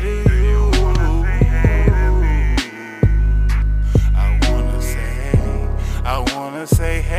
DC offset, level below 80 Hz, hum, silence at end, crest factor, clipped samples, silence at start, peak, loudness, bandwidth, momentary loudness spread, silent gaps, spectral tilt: under 0.1%; -16 dBFS; none; 0 s; 14 dB; under 0.1%; 0 s; 0 dBFS; -18 LUFS; 14 kHz; 7 LU; none; -6 dB/octave